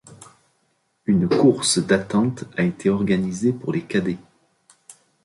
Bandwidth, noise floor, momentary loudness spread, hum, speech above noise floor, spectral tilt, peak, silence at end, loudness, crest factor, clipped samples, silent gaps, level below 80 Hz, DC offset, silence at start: 11.5 kHz; -68 dBFS; 9 LU; none; 48 dB; -5 dB/octave; -4 dBFS; 0.35 s; -21 LUFS; 18 dB; under 0.1%; none; -54 dBFS; under 0.1%; 0.1 s